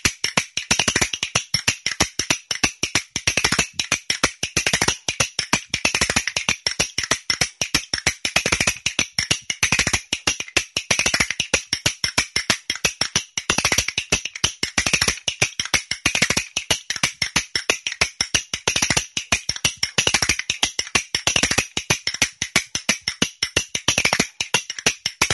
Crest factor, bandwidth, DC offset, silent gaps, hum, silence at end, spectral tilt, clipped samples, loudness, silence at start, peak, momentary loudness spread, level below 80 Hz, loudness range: 22 dB; 12 kHz; under 0.1%; none; none; 0 s; -1 dB/octave; under 0.1%; -20 LUFS; 0.05 s; 0 dBFS; 4 LU; -44 dBFS; 1 LU